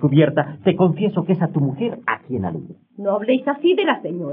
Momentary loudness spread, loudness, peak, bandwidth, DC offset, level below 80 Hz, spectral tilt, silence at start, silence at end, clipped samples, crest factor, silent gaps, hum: 9 LU; -20 LUFS; -4 dBFS; 3.8 kHz; under 0.1%; -74 dBFS; -6.5 dB/octave; 0 s; 0 s; under 0.1%; 16 dB; none; none